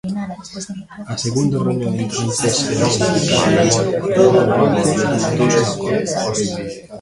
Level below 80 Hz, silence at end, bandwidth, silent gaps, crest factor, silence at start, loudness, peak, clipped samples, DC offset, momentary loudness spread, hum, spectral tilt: -46 dBFS; 0 s; 11.5 kHz; none; 16 dB; 0.05 s; -16 LUFS; 0 dBFS; under 0.1%; under 0.1%; 14 LU; none; -4.5 dB/octave